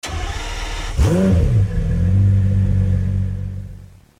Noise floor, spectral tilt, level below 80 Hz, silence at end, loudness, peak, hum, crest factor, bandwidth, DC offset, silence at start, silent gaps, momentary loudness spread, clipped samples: -38 dBFS; -7 dB/octave; -24 dBFS; 0.35 s; -18 LUFS; -4 dBFS; none; 12 dB; 11 kHz; under 0.1%; 0.05 s; none; 12 LU; under 0.1%